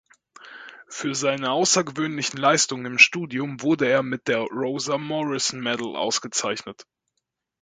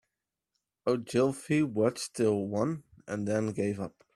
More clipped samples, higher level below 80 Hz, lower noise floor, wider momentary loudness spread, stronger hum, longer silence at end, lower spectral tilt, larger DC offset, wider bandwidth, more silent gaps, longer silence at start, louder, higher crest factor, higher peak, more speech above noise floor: neither; about the same, -70 dBFS vs -68 dBFS; second, -79 dBFS vs -87 dBFS; first, 14 LU vs 8 LU; neither; first, 0.8 s vs 0.25 s; second, -2.5 dB/octave vs -6 dB/octave; neither; second, 9.6 kHz vs 14 kHz; neither; second, 0.4 s vs 0.85 s; first, -22 LUFS vs -31 LUFS; first, 24 dB vs 18 dB; first, 0 dBFS vs -14 dBFS; about the same, 56 dB vs 57 dB